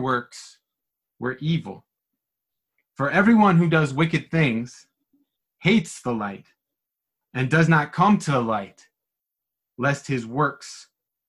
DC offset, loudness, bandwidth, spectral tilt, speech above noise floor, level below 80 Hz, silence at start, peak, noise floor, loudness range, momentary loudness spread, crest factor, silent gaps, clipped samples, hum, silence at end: under 0.1%; -22 LUFS; 11.5 kHz; -6.5 dB/octave; 63 dB; -58 dBFS; 0 s; -4 dBFS; -85 dBFS; 5 LU; 21 LU; 20 dB; none; under 0.1%; none; 0.45 s